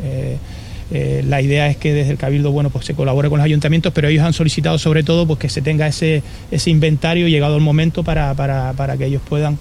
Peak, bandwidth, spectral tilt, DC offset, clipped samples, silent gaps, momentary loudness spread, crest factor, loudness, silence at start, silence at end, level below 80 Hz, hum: -2 dBFS; 11.5 kHz; -6.5 dB/octave; under 0.1%; under 0.1%; none; 7 LU; 14 dB; -16 LUFS; 0 s; 0 s; -32 dBFS; none